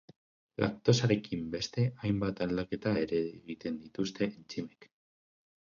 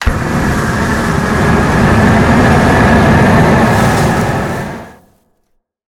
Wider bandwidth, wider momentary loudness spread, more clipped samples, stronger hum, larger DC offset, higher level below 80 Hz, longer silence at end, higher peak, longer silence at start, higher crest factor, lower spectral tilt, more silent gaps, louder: second, 7.4 kHz vs 18 kHz; first, 13 LU vs 8 LU; neither; neither; neither; second, -60 dBFS vs -22 dBFS; second, 0.85 s vs 1 s; second, -12 dBFS vs 0 dBFS; first, 0.6 s vs 0 s; first, 22 dB vs 10 dB; about the same, -6 dB/octave vs -6.5 dB/octave; neither; second, -33 LUFS vs -10 LUFS